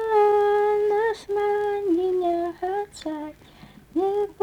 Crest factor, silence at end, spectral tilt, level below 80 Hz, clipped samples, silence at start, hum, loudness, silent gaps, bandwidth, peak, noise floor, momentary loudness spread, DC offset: 14 dB; 0.1 s; -5.5 dB/octave; -58 dBFS; under 0.1%; 0 s; none; -23 LUFS; none; 10 kHz; -10 dBFS; -48 dBFS; 13 LU; under 0.1%